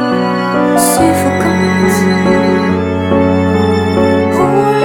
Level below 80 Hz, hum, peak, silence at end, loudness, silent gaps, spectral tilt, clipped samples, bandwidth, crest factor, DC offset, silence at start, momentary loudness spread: -40 dBFS; none; 0 dBFS; 0 s; -11 LUFS; none; -5.5 dB/octave; under 0.1%; 18 kHz; 10 dB; under 0.1%; 0 s; 3 LU